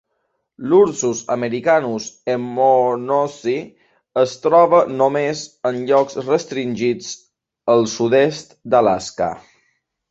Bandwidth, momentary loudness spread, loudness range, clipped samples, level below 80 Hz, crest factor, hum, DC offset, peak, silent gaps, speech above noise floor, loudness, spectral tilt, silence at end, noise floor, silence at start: 8 kHz; 11 LU; 2 LU; under 0.1%; -60 dBFS; 18 dB; none; under 0.1%; -2 dBFS; none; 54 dB; -18 LUFS; -5 dB/octave; 0.7 s; -71 dBFS; 0.6 s